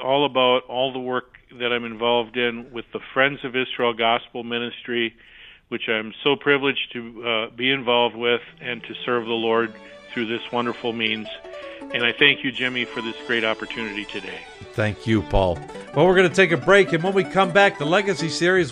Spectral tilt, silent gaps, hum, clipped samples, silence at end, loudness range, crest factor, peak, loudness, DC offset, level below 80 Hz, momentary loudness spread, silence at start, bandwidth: -5 dB/octave; none; none; under 0.1%; 0 s; 6 LU; 20 dB; -2 dBFS; -21 LUFS; under 0.1%; -44 dBFS; 14 LU; 0 s; 10.5 kHz